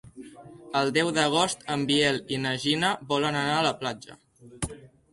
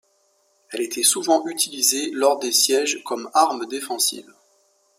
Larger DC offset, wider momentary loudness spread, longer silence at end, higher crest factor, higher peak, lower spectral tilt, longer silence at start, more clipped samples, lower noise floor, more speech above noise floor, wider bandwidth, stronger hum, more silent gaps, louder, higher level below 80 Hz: neither; about the same, 13 LU vs 11 LU; second, 0.25 s vs 0.8 s; about the same, 20 dB vs 20 dB; second, -8 dBFS vs -2 dBFS; first, -4 dB/octave vs 0 dB/octave; second, 0.05 s vs 0.7 s; neither; second, -46 dBFS vs -64 dBFS; second, 20 dB vs 43 dB; second, 11.5 kHz vs 16 kHz; neither; neither; second, -26 LUFS vs -20 LUFS; first, -56 dBFS vs -78 dBFS